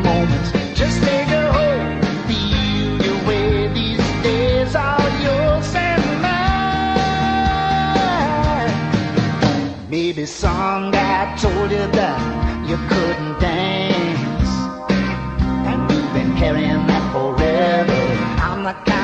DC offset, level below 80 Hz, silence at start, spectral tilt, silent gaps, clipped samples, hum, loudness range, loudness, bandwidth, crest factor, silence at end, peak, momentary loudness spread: under 0.1%; -28 dBFS; 0 s; -6 dB/octave; none; under 0.1%; none; 2 LU; -18 LUFS; 8.8 kHz; 14 dB; 0 s; -2 dBFS; 4 LU